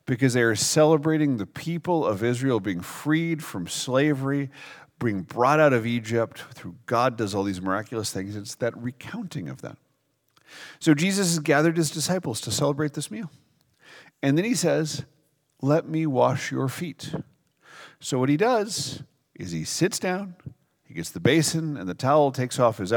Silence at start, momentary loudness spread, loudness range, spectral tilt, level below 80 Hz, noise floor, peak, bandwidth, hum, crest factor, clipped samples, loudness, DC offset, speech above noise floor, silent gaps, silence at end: 0.05 s; 15 LU; 4 LU; -5 dB/octave; -66 dBFS; -71 dBFS; -4 dBFS; 19.5 kHz; none; 20 dB; under 0.1%; -24 LUFS; under 0.1%; 46 dB; none; 0 s